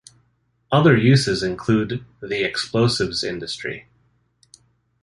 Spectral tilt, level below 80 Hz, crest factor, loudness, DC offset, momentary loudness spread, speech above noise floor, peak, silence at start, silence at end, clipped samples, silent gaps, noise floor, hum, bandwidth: -5.5 dB/octave; -50 dBFS; 20 dB; -20 LUFS; under 0.1%; 14 LU; 46 dB; -2 dBFS; 0.7 s; 1.2 s; under 0.1%; none; -65 dBFS; none; 11.5 kHz